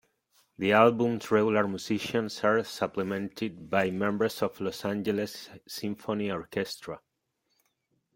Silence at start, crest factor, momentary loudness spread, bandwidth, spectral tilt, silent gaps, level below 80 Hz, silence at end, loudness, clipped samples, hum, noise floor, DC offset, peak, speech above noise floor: 0.6 s; 22 dB; 13 LU; 16.5 kHz; -5.5 dB/octave; none; -68 dBFS; 1.2 s; -29 LUFS; under 0.1%; none; -78 dBFS; under 0.1%; -6 dBFS; 49 dB